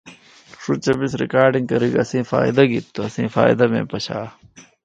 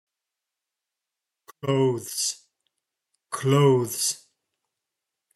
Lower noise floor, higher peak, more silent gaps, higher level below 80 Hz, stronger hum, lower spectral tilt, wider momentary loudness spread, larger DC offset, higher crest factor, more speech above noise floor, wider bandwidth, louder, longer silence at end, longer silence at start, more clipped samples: second, -46 dBFS vs -86 dBFS; first, 0 dBFS vs -6 dBFS; neither; first, -54 dBFS vs -74 dBFS; neither; first, -6.5 dB/octave vs -5 dB/octave; second, 12 LU vs 16 LU; neither; about the same, 20 dB vs 20 dB; second, 27 dB vs 64 dB; second, 9 kHz vs 12.5 kHz; first, -19 LUFS vs -24 LUFS; second, 0.25 s vs 1.2 s; second, 0.05 s vs 1.65 s; neither